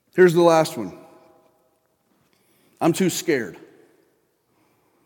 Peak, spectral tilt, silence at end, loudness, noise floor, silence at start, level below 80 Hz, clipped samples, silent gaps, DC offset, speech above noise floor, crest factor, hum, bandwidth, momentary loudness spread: -2 dBFS; -5.5 dB/octave; 1.5 s; -19 LUFS; -66 dBFS; 0.15 s; -74 dBFS; under 0.1%; none; under 0.1%; 48 dB; 20 dB; none; 17.5 kHz; 19 LU